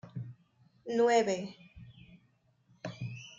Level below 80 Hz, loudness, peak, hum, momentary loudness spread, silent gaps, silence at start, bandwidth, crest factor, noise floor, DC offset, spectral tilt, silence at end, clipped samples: -70 dBFS; -31 LUFS; -16 dBFS; none; 27 LU; none; 0.05 s; 7.8 kHz; 20 dB; -70 dBFS; under 0.1%; -5 dB/octave; 0.05 s; under 0.1%